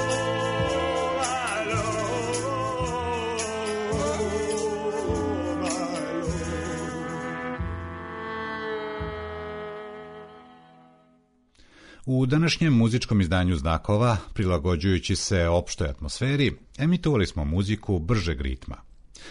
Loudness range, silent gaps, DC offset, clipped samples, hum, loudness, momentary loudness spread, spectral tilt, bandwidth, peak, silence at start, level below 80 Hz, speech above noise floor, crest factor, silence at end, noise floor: 11 LU; none; under 0.1%; under 0.1%; none; -26 LUFS; 12 LU; -5.5 dB/octave; 11 kHz; -12 dBFS; 0 s; -40 dBFS; 38 dB; 14 dB; 0 s; -62 dBFS